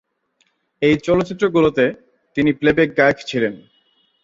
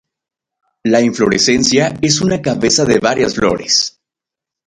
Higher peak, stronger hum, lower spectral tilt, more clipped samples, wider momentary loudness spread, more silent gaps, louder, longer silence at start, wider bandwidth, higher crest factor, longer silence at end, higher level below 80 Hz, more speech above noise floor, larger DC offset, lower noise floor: about the same, -2 dBFS vs 0 dBFS; neither; first, -6.5 dB/octave vs -3.5 dB/octave; neither; about the same, 7 LU vs 5 LU; neither; second, -18 LUFS vs -13 LUFS; about the same, 0.8 s vs 0.85 s; second, 7.8 kHz vs 11.5 kHz; about the same, 18 dB vs 14 dB; about the same, 0.65 s vs 0.75 s; second, -50 dBFS vs -44 dBFS; second, 48 dB vs 72 dB; neither; second, -65 dBFS vs -85 dBFS